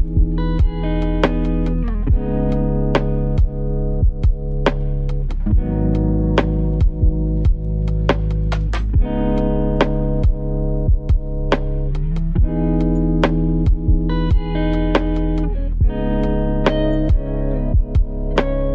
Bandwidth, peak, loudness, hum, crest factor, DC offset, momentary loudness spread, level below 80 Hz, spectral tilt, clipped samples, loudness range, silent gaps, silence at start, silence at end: 6 kHz; 0 dBFS; -20 LUFS; none; 16 dB; under 0.1%; 4 LU; -18 dBFS; -9 dB/octave; under 0.1%; 1 LU; none; 0 s; 0 s